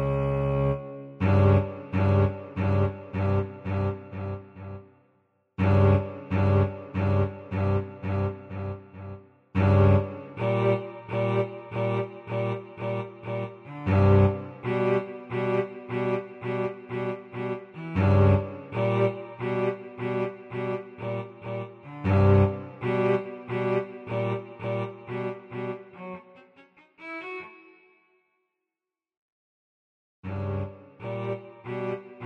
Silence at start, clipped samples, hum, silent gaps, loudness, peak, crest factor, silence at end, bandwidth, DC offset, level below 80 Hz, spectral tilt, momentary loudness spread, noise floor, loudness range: 0 s; under 0.1%; none; 29.17-30.23 s; -27 LUFS; -8 dBFS; 20 dB; 0 s; 4.4 kHz; under 0.1%; -50 dBFS; -10 dB/octave; 16 LU; -89 dBFS; 13 LU